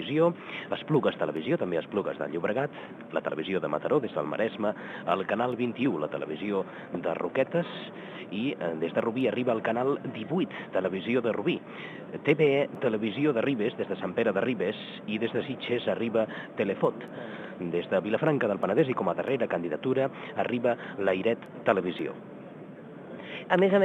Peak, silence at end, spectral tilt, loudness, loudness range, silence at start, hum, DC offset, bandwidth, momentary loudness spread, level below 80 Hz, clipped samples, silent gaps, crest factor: -8 dBFS; 0 s; -8 dB/octave; -29 LUFS; 3 LU; 0 s; none; under 0.1%; 8.2 kHz; 11 LU; -74 dBFS; under 0.1%; none; 22 dB